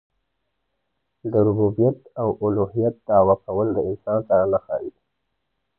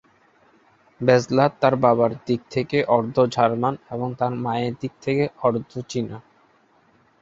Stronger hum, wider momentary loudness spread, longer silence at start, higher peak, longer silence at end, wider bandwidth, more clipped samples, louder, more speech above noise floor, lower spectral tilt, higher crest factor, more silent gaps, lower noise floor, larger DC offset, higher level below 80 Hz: neither; second, 8 LU vs 11 LU; first, 1.25 s vs 1 s; about the same, -4 dBFS vs -2 dBFS; about the same, 0.9 s vs 1 s; second, 2 kHz vs 7.8 kHz; neither; about the same, -21 LUFS vs -22 LUFS; first, 56 dB vs 38 dB; first, -14 dB/octave vs -6.5 dB/octave; about the same, 18 dB vs 20 dB; neither; first, -77 dBFS vs -59 dBFS; neither; first, -50 dBFS vs -60 dBFS